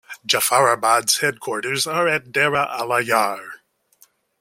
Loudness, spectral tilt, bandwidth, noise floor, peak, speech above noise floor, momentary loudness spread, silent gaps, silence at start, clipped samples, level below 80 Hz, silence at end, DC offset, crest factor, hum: -19 LUFS; -2 dB/octave; 16.5 kHz; -57 dBFS; -2 dBFS; 37 dB; 8 LU; none; 0.1 s; under 0.1%; -64 dBFS; 0.85 s; under 0.1%; 20 dB; none